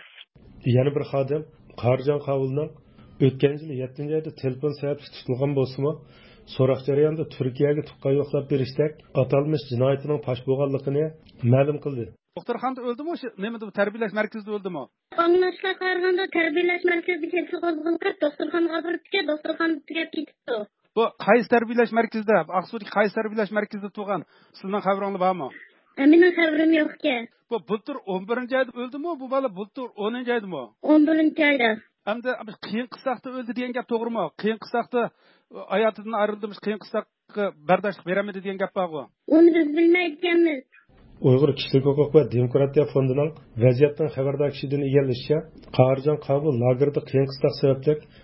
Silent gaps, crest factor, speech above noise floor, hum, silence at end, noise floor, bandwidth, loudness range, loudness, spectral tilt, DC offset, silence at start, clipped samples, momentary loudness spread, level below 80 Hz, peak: none; 22 dB; 26 dB; none; 0.25 s; -49 dBFS; 5.8 kHz; 6 LU; -24 LUFS; -11.5 dB/octave; under 0.1%; 0.55 s; under 0.1%; 12 LU; -60 dBFS; -2 dBFS